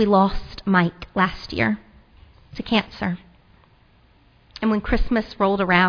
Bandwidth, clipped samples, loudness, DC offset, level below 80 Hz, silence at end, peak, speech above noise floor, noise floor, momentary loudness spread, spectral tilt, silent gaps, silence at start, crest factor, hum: 5.4 kHz; under 0.1%; -22 LUFS; under 0.1%; -34 dBFS; 0 s; -4 dBFS; 35 dB; -55 dBFS; 12 LU; -7.5 dB/octave; none; 0 s; 18 dB; none